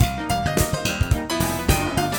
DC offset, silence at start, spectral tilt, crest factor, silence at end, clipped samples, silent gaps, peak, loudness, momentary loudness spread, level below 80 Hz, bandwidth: under 0.1%; 0 s; -4.5 dB/octave; 18 dB; 0 s; under 0.1%; none; -4 dBFS; -22 LUFS; 2 LU; -30 dBFS; 19.5 kHz